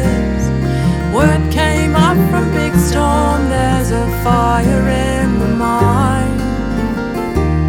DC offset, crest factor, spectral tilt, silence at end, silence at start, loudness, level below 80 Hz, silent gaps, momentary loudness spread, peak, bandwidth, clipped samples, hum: under 0.1%; 12 dB; -6.5 dB/octave; 0 s; 0 s; -14 LUFS; -22 dBFS; none; 6 LU; 0 dBFS; 17.5 kHz; under 0.1%; none